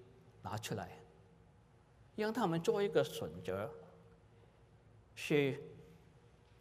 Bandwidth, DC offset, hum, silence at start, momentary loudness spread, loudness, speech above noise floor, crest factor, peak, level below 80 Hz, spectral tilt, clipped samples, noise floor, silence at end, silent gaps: 15.5 kHz; under 0.1%; none; 0 s; 22 LU; -38 LUFS; 28 dB; 20 dB; -20 dBFS; -72 dBFS; -5.5 dB/octave; under 0.1%; -65 dBFS; 0.4 s; none